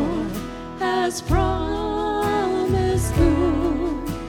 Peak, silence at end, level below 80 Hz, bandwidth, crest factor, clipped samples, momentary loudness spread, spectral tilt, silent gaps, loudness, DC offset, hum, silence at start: -6 dBFS; 0 s; -30 dBFS; 17.5 kHz; 16 dB; under 0.1%; 8 LU; -6 dB/octave; none; -22 LUFS; under 0.1%; none; 0 s